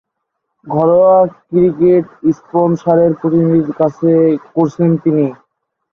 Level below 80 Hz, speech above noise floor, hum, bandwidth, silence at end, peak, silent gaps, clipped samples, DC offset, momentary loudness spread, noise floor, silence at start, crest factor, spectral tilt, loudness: -54 dBFS; 61 dB; none; 6.6 kHz; 0.6 s; -2 dBFS; none; under 0.1%; under 0.1%; 6 LU; -73 dBFS; 0.65 s; 12 dB; -10.5 dB/octave; -13 LUFS